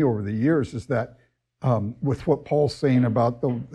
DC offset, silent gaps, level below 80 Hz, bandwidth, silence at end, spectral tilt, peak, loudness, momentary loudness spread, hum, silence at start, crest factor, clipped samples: under 0.1%; none; -54 dBFS; 10.5 kHz; 0 s; -8.5 dB/octave; -8 dBFS; -24 LUFS; 7 LU; none; 0 s; 14 dB; under 0.1%